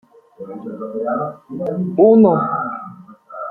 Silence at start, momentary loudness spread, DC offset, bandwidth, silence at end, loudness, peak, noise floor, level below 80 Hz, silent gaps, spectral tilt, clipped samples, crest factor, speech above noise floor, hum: 0.4 s; 23 LU; under 0.1%; 3.9 kHz; 0 s; -17 LUFS; -2 dBFS; -38 dBFS; -64 dBFS; none; -12 dB/octave; under 0.1%; 16 dB; 22 dB; none